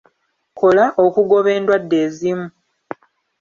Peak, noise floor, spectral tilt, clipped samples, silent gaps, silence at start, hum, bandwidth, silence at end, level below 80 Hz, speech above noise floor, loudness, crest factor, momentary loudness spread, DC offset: -2 dBFS; -64 dBFS; -6.5 dB/octave; under 0.1%; none; 0.55 s; none; 7.2 kHz; 0.9 s; -62 dBFS; 50 dB; -16 LUFS; 16 dB; 21 LU; under 0.1%